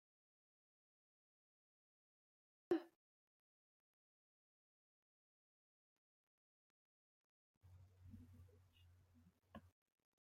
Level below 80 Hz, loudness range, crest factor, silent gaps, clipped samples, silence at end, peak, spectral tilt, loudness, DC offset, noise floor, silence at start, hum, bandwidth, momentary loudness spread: -86 dBFS; 15 LU; 30 dB; 2.96-7.61 s; under 0.1%; 0.6 s; -28 dBFS; -7.5 dB/octave; -45 LUFS; under 0.1%; -74 dBFS; 2.7 s; none; 10 kHz; 23 LU